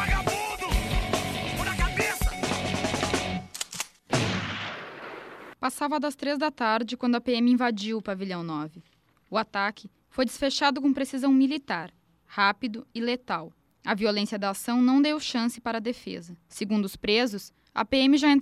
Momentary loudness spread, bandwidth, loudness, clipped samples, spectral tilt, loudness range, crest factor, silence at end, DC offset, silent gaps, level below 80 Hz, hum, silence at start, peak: 13 LU; 14.5 kHz; -27 LUFS; under 0.1%; -4.5 dB/octave; 3 LU; 18 dB; 0 s; under 0.1%; none; -40 dBFS; none; 0 s; -8 dBFS